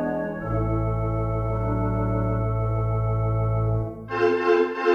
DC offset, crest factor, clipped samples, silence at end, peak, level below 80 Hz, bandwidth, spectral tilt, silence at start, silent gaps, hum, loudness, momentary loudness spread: under 0.1%; 16 dB; under 0.1%; 0 s; -8 dBFS; -34 dBFS; 6.2 kHz; -9 dB/octave; 0 s; none; none; -24 LUFS; 6 LU